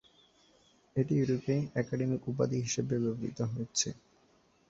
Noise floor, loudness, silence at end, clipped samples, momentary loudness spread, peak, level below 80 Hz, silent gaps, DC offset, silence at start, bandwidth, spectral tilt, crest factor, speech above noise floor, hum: -67 dBFS; -33 LUFS; 0.75 s; under 0.1%; 6 LU; -16 dBFS; -64 dBFS; none; under 0.1%; 0.95 s; 8 kHz; -5.5 dB/octave; 18 dB; 35 dB; none